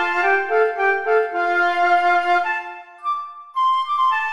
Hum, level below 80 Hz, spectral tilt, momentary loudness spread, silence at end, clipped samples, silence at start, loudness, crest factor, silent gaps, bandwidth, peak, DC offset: none; -70 dBFS; -2.5 dB/octave; 10 LU; 0 s; under 0.1%; 0 s; -19 LUFS; 12 dB; none; 10.5 kHz; -6 dBFS; under 0.1%